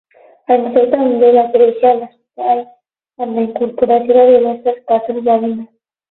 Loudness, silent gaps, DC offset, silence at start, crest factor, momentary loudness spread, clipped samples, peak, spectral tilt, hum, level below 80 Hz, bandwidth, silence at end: -13 LUFS; none; under 0.1%; 0.5 s; 14 dB; 12 LU; under 0.1%; 0 dBFS; -9.5 dB/octave; none; -60 dBFS; 4.1 kHz; 0.45 s